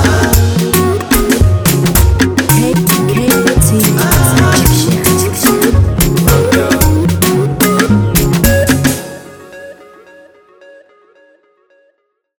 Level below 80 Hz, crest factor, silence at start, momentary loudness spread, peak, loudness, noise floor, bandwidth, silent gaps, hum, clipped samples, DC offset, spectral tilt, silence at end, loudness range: -22 dBFS; 10 dB; 0 s; 3 LU; 0 dBFS; -10 LUFS; -60 dBFS; over 20 kHz; none; none; under 0.1%; under 0.1%; -5 dB/octave; 2.65 s; 6 LU